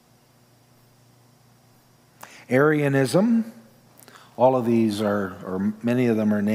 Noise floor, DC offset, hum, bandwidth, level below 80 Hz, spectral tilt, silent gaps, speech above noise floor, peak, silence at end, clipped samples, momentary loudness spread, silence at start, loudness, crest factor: -57 dBFS; under 0.1%; 60 Hz at -50 dBFS; 16 kHz; -72 dBFS; -7 dB/octave; none; 37 dB; -4 dBFS; 0 s; under 0.1%; 8 LU; 2.5 s; -22 LUFS; 20 dB